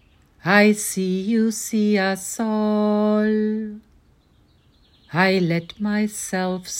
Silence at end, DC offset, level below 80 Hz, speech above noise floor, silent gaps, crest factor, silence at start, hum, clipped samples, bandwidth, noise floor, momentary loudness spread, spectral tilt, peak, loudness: 0 s; under 0.1%; -60 dBFS; 37 dB; none; 18 dB; 0.45 s; none; under 0.1%; 16.5 kHz; -57 dBFS; 8 LU; -5 dB/octave; -2 dBFS; -21 LUFS